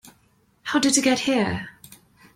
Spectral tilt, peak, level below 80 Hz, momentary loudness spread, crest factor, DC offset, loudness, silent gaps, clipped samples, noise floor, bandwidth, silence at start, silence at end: -3 dB/octave; -4 dBFS; -58 dBFS; 17 LU; 20 dB; under 0.1%; -21 LUFS; none; under 0.1%; -62 dBFS; 16 kHz; 0.65 s; 0.65 s